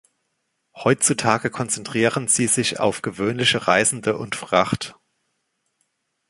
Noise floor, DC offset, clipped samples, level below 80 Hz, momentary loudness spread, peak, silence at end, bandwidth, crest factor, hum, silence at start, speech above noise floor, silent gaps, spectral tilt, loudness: -74 dBFS; under 0.1%; under 0.1%; -58 dBFS; 8 LU; -2 dBFS; 1.35 s; 12 kHz; 20 dB; none; 0.75 s; 53 dB; none; -3 dB/octave; -20 LUFS